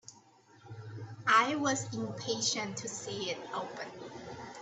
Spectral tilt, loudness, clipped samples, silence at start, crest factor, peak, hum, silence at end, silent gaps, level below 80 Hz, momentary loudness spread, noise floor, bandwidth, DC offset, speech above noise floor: -3 dB/octave; -32 LUFS; under 0.1%; 0.05 s; 22 dB; -12 dBFS; none; 0 s; none; -74 dBFS; 20 LU; -61 dBFS; 8.6 kHz; under 0.1%; 28 dB